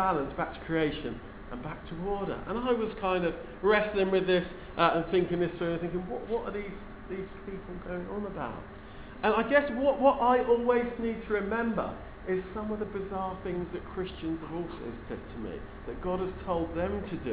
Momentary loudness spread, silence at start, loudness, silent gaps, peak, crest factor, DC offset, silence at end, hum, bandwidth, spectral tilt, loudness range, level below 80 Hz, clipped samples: 16 LU; 0 s; -31 LUFS; none; -10 dBFS; 20 dB; under 0.1%; 0 s; none; 4 kHz; -4.5 dB/octave; 9 LU; -48 dBFS; under 0.1%